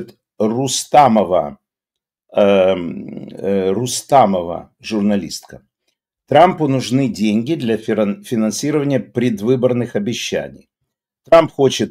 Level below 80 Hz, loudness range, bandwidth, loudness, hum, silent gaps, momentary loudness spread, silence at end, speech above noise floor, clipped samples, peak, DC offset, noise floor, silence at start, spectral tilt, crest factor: -54 dBFS; 3 LU; 16 kHz; -16 LUFS; none; none; 13 LU; 0 s; 68 dB; under 0.1%; 0 dBFS; under 0.1%; -84 dBFS; 0 s; -5 dB/octave; 16 dB